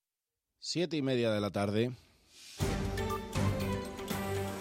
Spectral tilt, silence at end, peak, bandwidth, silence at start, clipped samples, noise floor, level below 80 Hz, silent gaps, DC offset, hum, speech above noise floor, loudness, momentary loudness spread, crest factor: -5.5 dB/octave; 0 s; -18 dBFS; 16.5 kHz; 0.6 s; under 0.1%; under -90 dBFS; -48 dBFS; none; under 0.1%; none; over 58 dB; -34 LUFS; 8 LU; 18 dB